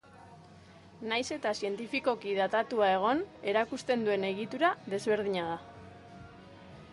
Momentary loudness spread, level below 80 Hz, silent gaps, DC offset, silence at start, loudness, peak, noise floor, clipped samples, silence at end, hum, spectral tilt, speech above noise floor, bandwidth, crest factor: 23 LU; -66 dBFS; none; under 0.1%; 0.15 s; -31 LUFS; -14 dBFS; -54 dBFS; under 0.1%; 0 s; none; -4.5 dB/octave; 24 dB; 11.5 kHz; 18 dB